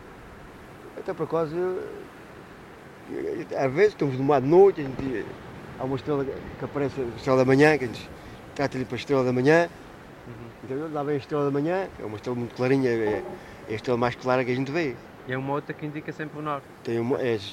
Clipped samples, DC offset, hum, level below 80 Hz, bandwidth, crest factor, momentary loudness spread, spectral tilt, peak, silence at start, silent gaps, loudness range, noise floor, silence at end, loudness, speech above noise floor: under 0.1%; under 0.1%; none; -56 dBFS; 13.5 kHz; 20 dB; 23 LU; -7 dB/octave; -6 dBFS; 0 s; none; 5 LU; -45 dBFS; 0 s; -26 LUFS; 20 dB